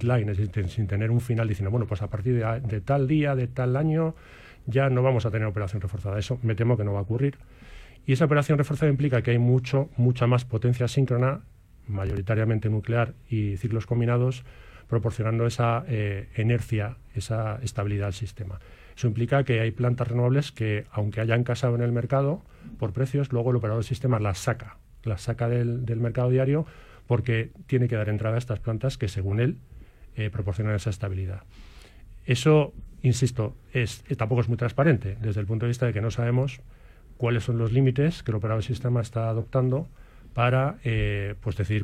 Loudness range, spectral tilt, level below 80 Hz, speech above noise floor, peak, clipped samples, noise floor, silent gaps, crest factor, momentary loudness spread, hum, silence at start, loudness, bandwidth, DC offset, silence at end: 3 LU; -7.5 dB/octave; -48 dBFS; 22 dB; -8 dBFS; under 0.1%; -47 dBFS; none; 18 dB; 9 LU; none; 0 s; -26 LUFS; 11.5 kHz; under 0.1%; 0 s